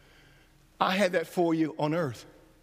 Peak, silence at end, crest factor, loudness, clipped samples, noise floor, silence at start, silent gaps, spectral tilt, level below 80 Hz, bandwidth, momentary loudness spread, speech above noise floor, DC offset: -8 dBFS; 0.35 s; 22 dB; -28 LUFS; under 0.1%; -59 dBFS; 0.8 s; none; -5.5 dB/octave; -66 dBFS; 15.5 kHz; 7 LU; 32 dB; under 0.1%